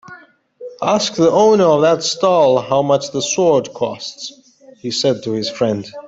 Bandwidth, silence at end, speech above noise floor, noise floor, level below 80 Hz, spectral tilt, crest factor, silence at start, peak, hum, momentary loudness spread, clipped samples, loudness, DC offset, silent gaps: 8 kHz; 0 s; 27 dB; -42 dBFS; -58 dBFS; -4.5 dB/octave; 14 dB; 0.1 s; -2 dBFS; none; 16 LU; under 0.1%; -15 LUFS; under 0.1%; none